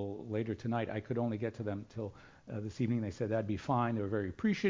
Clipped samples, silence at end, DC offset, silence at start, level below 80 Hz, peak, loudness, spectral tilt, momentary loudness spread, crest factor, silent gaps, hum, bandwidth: under 0.1%; 0 s; under 0.1%; 0 s; -60 dBFS; -18 dBFS; -37 LUFS; -8 dB/octave; 10 LU; 16 dB; none; none; 7.6 kHz